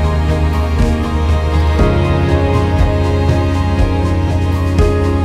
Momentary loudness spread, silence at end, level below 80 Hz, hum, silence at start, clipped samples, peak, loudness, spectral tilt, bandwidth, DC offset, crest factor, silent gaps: 2 LU; 0 s; -18 dBFS; none; 0 s; under 0.1%; 0 dBFS; -14 LUFS; -7.5 dB/octave; 10.5 kHz; under 0.1%; 12 dB; none